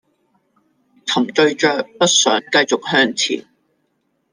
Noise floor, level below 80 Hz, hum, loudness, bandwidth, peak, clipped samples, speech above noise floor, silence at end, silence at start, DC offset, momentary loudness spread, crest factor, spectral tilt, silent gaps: -67 dBFS; -66 dBFS; none; -16 LUFS; 10.5 kHz; -2 dBFS; under 0.1%; 51 dB; 0.9 s; 1.05 s; under 0.1%; 7 LU; 18 dB; -2 dB/octave; none